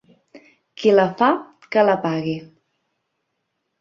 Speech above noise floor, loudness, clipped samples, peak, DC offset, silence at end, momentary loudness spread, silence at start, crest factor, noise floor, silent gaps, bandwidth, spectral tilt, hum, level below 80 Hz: 58 dB; -19 LUFS; under 0.1%; -2 dBFS; under 0.1%; 1.35 s; 10 LU; 0.8 s; 20 dB; -75 dBFS; none; 7.2 kHz; -7 dB/octave; none; -66 dBFS